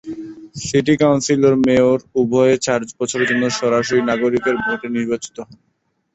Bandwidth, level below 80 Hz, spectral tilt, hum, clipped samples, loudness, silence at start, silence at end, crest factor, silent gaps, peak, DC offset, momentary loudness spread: 8.2 kHz; -52 dBFS; -5 dB/octave; none; under 0.1%; -17 LUFS; 0.05 s; 0.6 s; 16 dB; none; -2 dBFS; under 0.1%; 13 LU